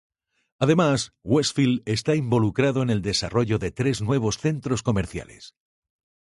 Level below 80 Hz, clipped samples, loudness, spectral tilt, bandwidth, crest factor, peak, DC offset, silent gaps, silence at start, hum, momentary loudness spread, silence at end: -48 dBFS; under 0.1%; -23 LUFS; -5.5 dB/octave; 11.5 kHz; 16 dB; -6 dBFS; under 0.1%; none; 0.6 s; none; 6 LU; 0.8 s